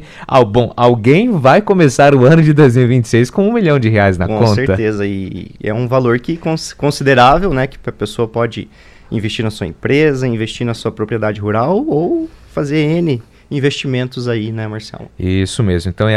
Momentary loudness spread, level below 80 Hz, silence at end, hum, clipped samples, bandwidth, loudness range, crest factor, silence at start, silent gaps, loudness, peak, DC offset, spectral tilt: 13 LU; -36 dBFS; 0 s; none; under 0.1%; 13 kHz; 8 LU; 12 dB; 0 s; none; -13 LUFS; 0 dBFS; under 0.1%; -6.5 dB/octave